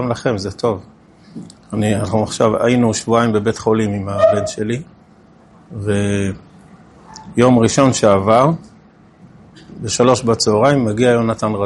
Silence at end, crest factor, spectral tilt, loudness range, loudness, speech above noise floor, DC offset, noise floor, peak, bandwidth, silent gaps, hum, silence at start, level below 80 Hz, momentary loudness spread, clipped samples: 0 s; 16 dB; -5.5 dB/octave; 4 LU; -16 LUFS; 32 dB; under 0.1%; -46 dBFS; 0 dBFS; 11.5 kHz; none; none; 0 s; -48 dBFS; 14 LU; under 0.1%